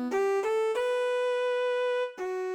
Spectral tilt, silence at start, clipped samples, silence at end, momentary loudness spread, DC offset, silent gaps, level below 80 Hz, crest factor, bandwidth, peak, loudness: -2 dB/octave; 0 s; under 0.1%; 0 s; 4 LU; under 0.1%; none; -76 dBFS; 10 dB; 12.5 kHz; -20 dBFS; -29 LUFS